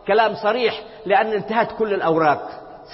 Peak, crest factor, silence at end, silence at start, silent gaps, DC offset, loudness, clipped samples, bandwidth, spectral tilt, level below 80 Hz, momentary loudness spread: -4 dBFS; 16 dB; 0 s; 0.05 s; none; under 0.1%; -20 LUFS; under 0.1%; 5.8 kHz; -9 dB/octave; -56 dBFS; 11 LU